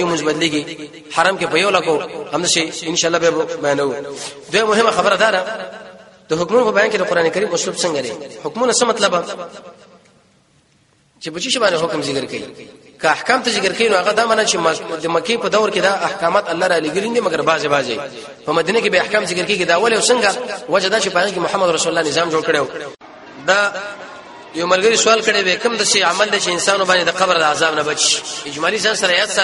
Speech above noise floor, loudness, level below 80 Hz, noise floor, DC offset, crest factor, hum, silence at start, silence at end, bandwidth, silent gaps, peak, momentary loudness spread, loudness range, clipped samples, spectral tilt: 39 dB; -16 LUFS; -58 dBFS; -56 dBFS; under 0.1%; 18 dB; none; 0 s; 0 s; 11.5 kHz; none; 0 dBFS; 13 LU; 5 LU; under 0.1%; -2 dB/octave